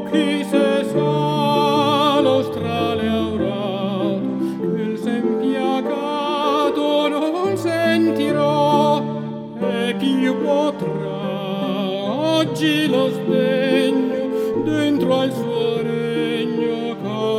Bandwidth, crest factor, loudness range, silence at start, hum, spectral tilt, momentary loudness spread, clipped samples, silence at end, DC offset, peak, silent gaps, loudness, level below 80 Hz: 15.5 kHz; 14 dB; 3 LU; 0 s; none; -6 dB/octave; 6 LU; under 0.1%; 0 s; under 0.1%; -4 dBFS; none; -19 LUFS; -58 dBFS